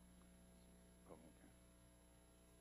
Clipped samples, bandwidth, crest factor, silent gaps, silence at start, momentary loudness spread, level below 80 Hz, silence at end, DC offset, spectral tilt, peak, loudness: under 0.1%; 15 kHz; 20 dB; none; 0 s; 5 LU; -72 dBFS; 0 s; under 0.1%; -5 dB/octave; -46 dBFS; -67 LUFS